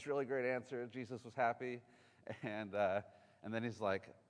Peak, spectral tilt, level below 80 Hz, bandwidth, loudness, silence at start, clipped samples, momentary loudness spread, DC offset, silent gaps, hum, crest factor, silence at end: -24 dBFS; -6.5 dB/octave; -86 dBFS; 10.5 kHz; -42 LUFS; 0 s; under 0.1%; 11 LU; under 0.1%; none; none; 20 dB; 0.2 s